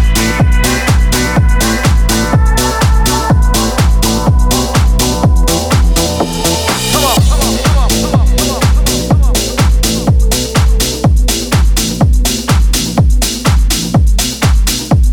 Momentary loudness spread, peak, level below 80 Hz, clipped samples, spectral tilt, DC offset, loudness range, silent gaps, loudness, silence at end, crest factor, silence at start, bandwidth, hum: 2 LU; 0 dBFS; -12 dBFS; under 0.1%; -4.5 dB/octave; under 0.1%; 1 LU; none; -11 LUFS; 0 s; 8 dB; 0 s; 19 kHz; none